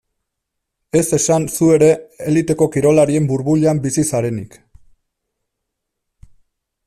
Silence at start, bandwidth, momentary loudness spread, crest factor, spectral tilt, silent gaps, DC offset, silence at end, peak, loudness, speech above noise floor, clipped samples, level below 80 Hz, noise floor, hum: 0.95 s; 14 kHz; 7 LU; 16 dB; -6 dB/octave; none; under 0.1%; 2.4 s; -2 dBFS; -15 LUFS; 63 dB; under 0.1%; -50 dBFS; -77 dBFS; none